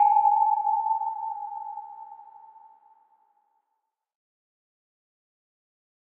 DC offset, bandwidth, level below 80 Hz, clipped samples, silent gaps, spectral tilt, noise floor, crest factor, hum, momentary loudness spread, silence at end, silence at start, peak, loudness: under 0.1%; 2.7 kHz; under -90 dBFS; under 0.1%; none; 1.5 dB/octave; -81 dBFS; 18 dB; none; 24 LU; 3.8 s; 0 s; -10 dBFS; -25 LUFS